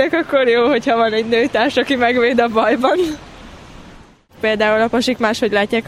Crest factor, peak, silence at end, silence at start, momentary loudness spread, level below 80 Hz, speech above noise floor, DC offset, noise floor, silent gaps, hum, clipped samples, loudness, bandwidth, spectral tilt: 16 dB; 0 dBFS; 0 s; 0 s; 4 LU; -48 dBFS; 28 dB; under 0.1%; -43 dBFS; none; none; under 0.1%; -15 LUFS; 14.5 kHz; -4.5 dB/octave